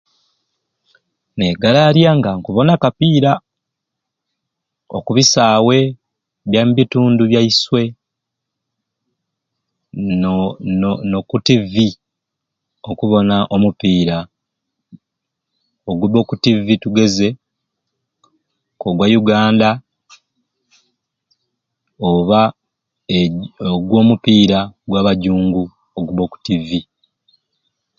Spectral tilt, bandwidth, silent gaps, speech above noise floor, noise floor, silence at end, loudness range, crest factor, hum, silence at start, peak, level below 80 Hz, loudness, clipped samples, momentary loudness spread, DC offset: -5.5 dB/octave; 7.6 kHz; none; 66 dB; -79 dBFS; 1.15 s; 5 LU; 16 dB; none; 1.35 s; 0 dBFS; -46 dBFS; -14 LUFS; under 0.1%; 12 LU; under 0.1%